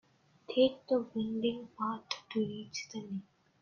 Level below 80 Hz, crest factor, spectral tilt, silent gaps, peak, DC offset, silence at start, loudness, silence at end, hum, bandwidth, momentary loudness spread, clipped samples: -74 dBFS; 20 dB; -5 dB/octave; none; -14 dBFS; under 0.1%; 0.5 s; -35 LUFS; 0.4 s; none; 7.2 kHz; 12 LU; under 0.1%